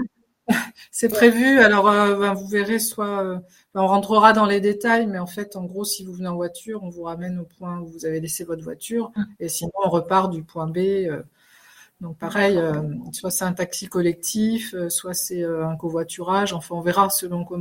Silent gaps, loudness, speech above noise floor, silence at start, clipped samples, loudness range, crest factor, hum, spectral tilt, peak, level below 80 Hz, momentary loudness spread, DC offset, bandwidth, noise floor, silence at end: none; -21 LUFS; 30 dB; 0 s; under 0.1%; 11 LU; 22 dB; none; -4.5 dB/octave; 0 dBFS; -60 dBFS; 16 LU; under 0.1%; 16.5 kHz; -52 dBFS; 0 s